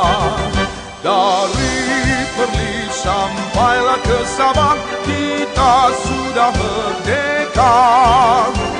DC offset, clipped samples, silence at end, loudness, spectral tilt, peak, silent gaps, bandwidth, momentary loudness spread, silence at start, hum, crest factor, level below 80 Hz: under 0.1%; under 0.1%; 0 s; -15 LUFS; -4 dB/octave; -2 dBFS; none; 10 kHz; 8 LU; 0 s; none; 14 dB; -30 dBFS